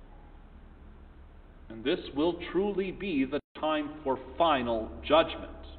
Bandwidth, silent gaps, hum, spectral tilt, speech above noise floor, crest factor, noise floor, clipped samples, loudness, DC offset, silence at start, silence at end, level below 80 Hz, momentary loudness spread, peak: 4.7 kHz; 3.44-3.55 s; none; -9 dB/octave; 22 dB; 22 dB; -51 dBFS; under 0.1%; -30 LUFS; under 0.1%; 0 s; 0 s; -50 dBFS; 9 LU; -10 dBFS